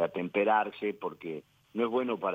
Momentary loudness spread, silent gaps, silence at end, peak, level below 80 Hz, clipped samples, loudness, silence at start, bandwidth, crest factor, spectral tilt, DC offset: 14 LU; none; 0 s; -14 dBFS; -80 dBFS; under 0.1%; -31 LUFS; 0 s; 16 kHz; 16 dB; -7.5 dB/octave; under 0.1%